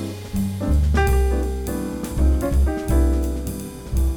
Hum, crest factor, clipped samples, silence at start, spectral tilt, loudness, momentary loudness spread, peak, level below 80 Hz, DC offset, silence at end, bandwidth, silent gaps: none; 14 dB; under 0.1%; 0 s; -7 dB/octave; -22 LUFS; 9 LU; -6 dBFS; -22 dBFS; under 0.1%; 0 s; 17.5 kHz; none